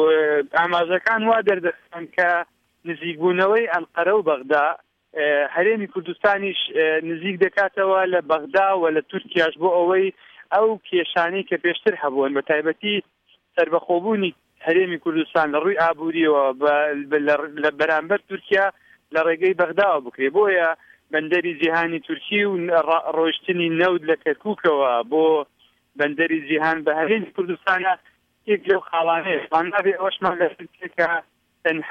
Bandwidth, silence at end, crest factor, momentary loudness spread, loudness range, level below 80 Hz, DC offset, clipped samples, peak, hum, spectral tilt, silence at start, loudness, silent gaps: 6.6 kHz; 0 s; 16 dB; 7 LU; 2 LU; -68 dBFS; under 0.1%; under 0.1%; -6 dBFS; none; -6.5 dB/octave; 0 s; -21 LUFS; none